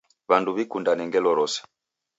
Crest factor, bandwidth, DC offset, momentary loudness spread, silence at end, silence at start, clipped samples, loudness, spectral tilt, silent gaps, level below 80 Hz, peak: 22 dB; 8 kHz; under 0.1%; 5 LU; 0.55 s; 0.3 s; under 0.1%; -24 LUFS; -4 dB/octave; none; -74 dBFS; -4 dBFS